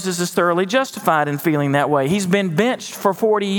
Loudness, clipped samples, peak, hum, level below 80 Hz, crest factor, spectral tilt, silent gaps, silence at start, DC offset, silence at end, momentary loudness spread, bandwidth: -18 LUFS; under 0.1%; 0 dBFS; none; -62 dBFS; 18 dB; -5 dB/octave; none; 0 s; under 0.1%; 0 s; 3 LU; over 20 kHz